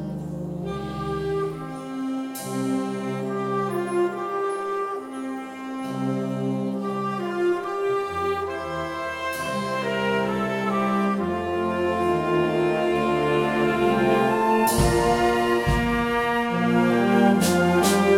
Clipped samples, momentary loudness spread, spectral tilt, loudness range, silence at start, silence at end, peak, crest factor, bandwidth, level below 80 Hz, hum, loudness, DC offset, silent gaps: under 0.1%; 10 LU; -5.5 dB/octave; 7 LU; 0 s; 0 s; -6 dBFS; 16 dB; 17.5 kHz; -42 dBFS; none; -24 LUFS; under 0.1%; none